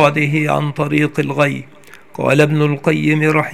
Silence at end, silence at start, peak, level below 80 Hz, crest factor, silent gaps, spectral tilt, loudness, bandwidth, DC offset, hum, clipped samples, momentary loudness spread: 0 s; 0 s; 0 dBFS; -54 dBFS; 16 dB; none; -7 dB/octave; -15 LUFS; 14 kHz; 0.6%; none; under 0.1%; 5 LU